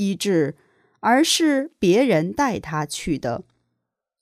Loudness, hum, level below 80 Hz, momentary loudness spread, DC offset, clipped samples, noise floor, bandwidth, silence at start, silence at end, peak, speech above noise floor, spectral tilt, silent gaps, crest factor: -21 LUFS; none; -52 dBFS; 10 LU; under 0.1%; under 0.1%; -79 dBFS; 15.5 kHz; 0 s; 0.8 s; -6 dBFS; 59 dB; -4.5 dB/octave; none; 16 dB